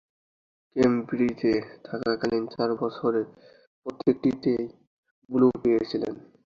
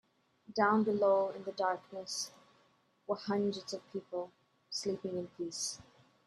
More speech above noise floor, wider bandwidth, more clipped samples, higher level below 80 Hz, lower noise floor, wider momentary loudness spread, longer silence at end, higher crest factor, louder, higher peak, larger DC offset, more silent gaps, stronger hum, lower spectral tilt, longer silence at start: first, over 65 dB vs 36 dB; second, 7.4 kHz vs 13 kHz; neither; first, -60 dBFS vs -78 dBFS; first, under -90 dBFS vs -71 dBFS; about the same, 14 LU vs 13 LU; about the same, 0.35 s vs 0.45 s; about the same, 18 dB vs 22 dB; first, -26 LUFS vs -35 LUFS; first, -8 dBFS vs -14 dBFS; neither; first, 3.67-3.82 s, 4.87-5.03 s, 5.11-5.22 s vs none; neither; first, -7.5 dB/octave vs -4 dB/octave; first, 0.75 s vs 0.5 s